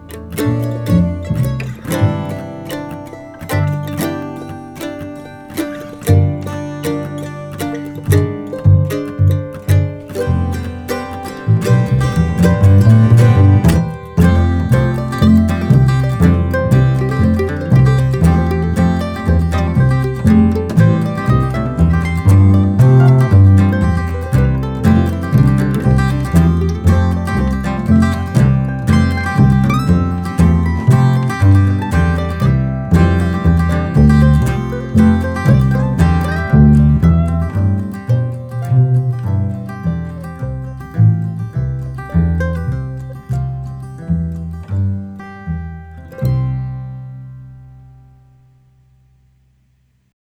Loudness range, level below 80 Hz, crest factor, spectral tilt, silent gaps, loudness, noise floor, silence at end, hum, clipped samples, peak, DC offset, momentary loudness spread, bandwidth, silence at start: 10 LU; -26 dBFS; 12 dB; -8 dB/octave; none; -14 LUFS; -57 dBFS; 2.7 s; none; under 0.1%; 0 dBFS; under 0.1%; 15 LU; 16.5 kHz; 0 s